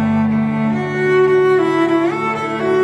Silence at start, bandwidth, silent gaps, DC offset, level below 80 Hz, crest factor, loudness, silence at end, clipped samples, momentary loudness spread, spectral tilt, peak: 0 s; 9.8 kHz; none; under 0.1%; -54 dBFS; 10 dB; -15 LUFS; 0 s; under 0.1%; 6 LU; -7.5 dB/octave; -4 dBFS